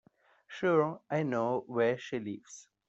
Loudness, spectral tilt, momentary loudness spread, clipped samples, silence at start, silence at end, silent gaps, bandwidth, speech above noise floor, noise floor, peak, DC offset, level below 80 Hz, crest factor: -32 LUFS; -6.5 dB/octave; 16 LU; under 0.1%; 0.5 s; 0.25 s; none; 8 kHz; 27 dB; -59 dBFS; -14 dBFS; under 0.1%; -76 dBFS; 18 dB